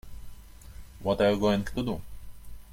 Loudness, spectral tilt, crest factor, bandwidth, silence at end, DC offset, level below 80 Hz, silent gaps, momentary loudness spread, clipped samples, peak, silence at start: -28 LUFS; -6.5 dB/octave; 18 dB; 16.5 kHz; 0 s; under 0.1%; -46 dBFS; none; 26 LU; under 0.1%; -12 dBFS; 0.05 s